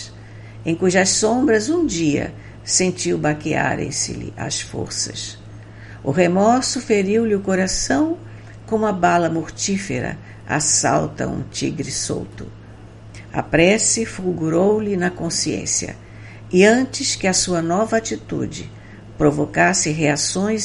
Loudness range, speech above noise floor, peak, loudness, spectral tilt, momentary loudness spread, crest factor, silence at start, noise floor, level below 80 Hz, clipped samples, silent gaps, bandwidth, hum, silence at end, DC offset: 3 LU; 20 dB; 0 dBFS; -19 LUFS; -4 dB/octave; 18 LU; 18 dB; 0 s; -39 dBFS; -44 dBFS; under 0.1%; none; 11.5 kHz; none; 0 s; under 0.1%